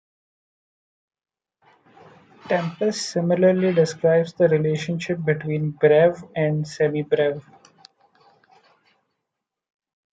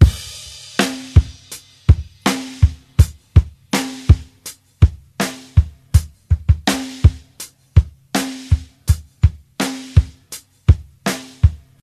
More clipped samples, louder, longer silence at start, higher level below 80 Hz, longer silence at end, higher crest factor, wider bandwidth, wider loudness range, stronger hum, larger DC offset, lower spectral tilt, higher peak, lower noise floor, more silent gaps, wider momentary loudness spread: neither; second, -21 LUFS vs -18 LUFS; first, 2.45 s vs 0 s; second, -66 dBFS vs -22 dBFS; first, 2.75 s vs 0.25 s; about the same, 18 dB vs 16 dB; second, 9.2 kHz vs 14 kHz; first, 8 LU vs 2 LU; neither; neither; about the same, -6.5 dB/octave vs -5.5 dB/octave; second, -6 dBFS vs 0 dBFS; first, -83 dBFS vs -39 dBFS; neither; second, 7 LU vs 15 LU